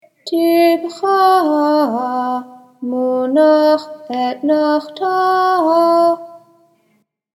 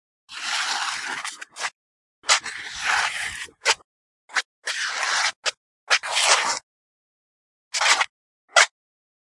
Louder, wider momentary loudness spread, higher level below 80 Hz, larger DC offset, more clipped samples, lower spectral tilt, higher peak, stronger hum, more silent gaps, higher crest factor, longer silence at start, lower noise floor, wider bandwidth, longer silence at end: first, -15 LUFS vs -22 LUFS; second, 10 LU vs 13 LU; second, -82 dBFS vs -66 dBFS; neither; neither; first, -4.5 dB/octave vs 2.5 dB/octave; about the same, 0 dBFS vs 0 dBFS; neither; second, none vs 1.75-2.22 s, 3.84-4.28 s, 4.45-4.62 s, 5.36-5.43 s, 5.57-5.87 s, 6.63-7.71 s, 8.09-8.48 s; second, 14 dB vs 26 dB; about the same, 0.25 s vs 0.3 s; second, -62 dBFS vs under -90 dBFS; about the same, 12.5 kHz vs 11.5 kHz; first, 1 s vs 0.55 s